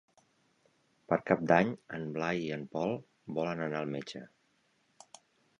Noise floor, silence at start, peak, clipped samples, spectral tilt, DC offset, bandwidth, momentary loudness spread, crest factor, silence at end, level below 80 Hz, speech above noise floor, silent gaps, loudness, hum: -73 dBFS; 1.1 s; -10 dBFS; under 0.1%; -6.5 dB/octave; under 0.1%; 10.5 kHz; 13 LU; 24 dB; 1.3 s; -70 dBFS; 41 dB; none; -33 LUFS; none